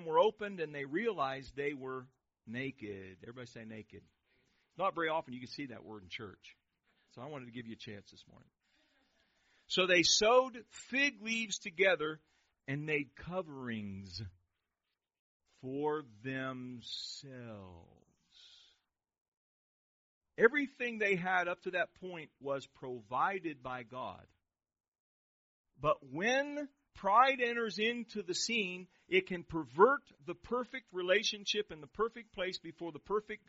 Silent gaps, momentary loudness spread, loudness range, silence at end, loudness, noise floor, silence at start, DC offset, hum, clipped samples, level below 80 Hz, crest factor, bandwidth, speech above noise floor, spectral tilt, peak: 15.19-15.40 s, 19.21-20.21 s, 24.88-24.92 s, 25.00-25.64 s; 20 LU; 14 LU; 0.1 s; -35 LUFS; -90 dBFS; 0 s; under 0.1%; none; under 0.1%; -70 dBFS; 26 dB; 7.6 kHz; 54 dB; -2 dB/octave; -12 dBFS